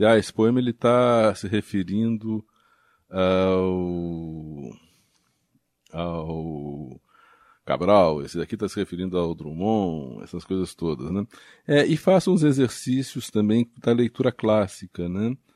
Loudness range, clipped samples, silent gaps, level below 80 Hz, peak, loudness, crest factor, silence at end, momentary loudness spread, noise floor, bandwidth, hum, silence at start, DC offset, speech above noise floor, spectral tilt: 9 LU; under 0.1%; none; -54 dBFS; -4 dBFS; -23 LUFS; 20 dB; 0.2 s; 15 LU; -70 dBFS; 13.5 kHz; none; 0 s; under 0.1%; 47 dB; -6.5 dB/octave